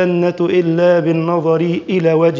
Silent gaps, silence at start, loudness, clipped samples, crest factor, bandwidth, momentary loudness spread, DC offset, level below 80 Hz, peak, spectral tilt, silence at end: none; 0 s; -14 LUFS; under 0.1%; 12 dB; 7.4 kHz; 3 LU; under 0.1%; -58 dBFS; -2 dBFS; -8.5 dB/octave; 0 s